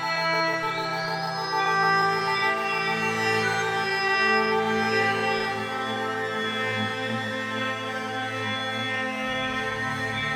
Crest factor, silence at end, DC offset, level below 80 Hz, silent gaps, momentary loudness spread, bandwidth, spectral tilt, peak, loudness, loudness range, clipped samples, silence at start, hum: 16 dB; 0 s; under 0.1%; -60 dBFS; none; 7 LU; 18 kHz; -4 dB/octave; -10 dBFS; -25 LUFS; 5 LU; under 0.1%; 0 s; none